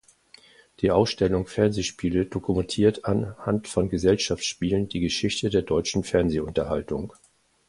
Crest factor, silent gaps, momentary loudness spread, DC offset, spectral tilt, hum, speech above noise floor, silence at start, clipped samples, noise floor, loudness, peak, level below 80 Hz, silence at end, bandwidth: 20 dB; none; 6 LU; under 0.1%; -5.5 dB/octave; none; 30 dB; 0.8 s; under 0.1%; -55 dBFS; -25 LUFS; -6 dBFS; -44 dBFS; 0.6 s; 11.5 kHz